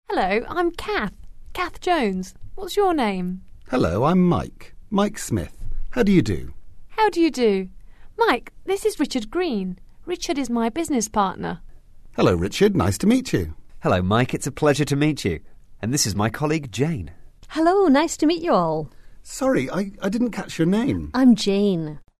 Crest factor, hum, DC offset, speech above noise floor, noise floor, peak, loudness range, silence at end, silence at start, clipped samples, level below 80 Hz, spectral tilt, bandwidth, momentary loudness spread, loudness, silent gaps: 16 dB; none; under 0.1%; 21 dB; -42 dBFS; -4 dBFS; 3 LU; 0.2 s; 0.1 s; under 0.1%; -40 dBFS; -5.5 dB/octave; 13.5 kHz; 13 LU; -22 LUFS; none